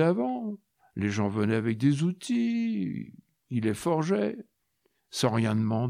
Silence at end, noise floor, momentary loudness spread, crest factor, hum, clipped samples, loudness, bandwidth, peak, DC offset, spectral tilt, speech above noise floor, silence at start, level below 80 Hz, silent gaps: 0 s; -74 dBFS; 13 LU; 18 dB; none; under 0.1%; -28 LUFS; 15 kHz; -12 dBFS; under 0.1%; -6.5 dB/octave; 47 dB; 0 s; -68 dBFS; none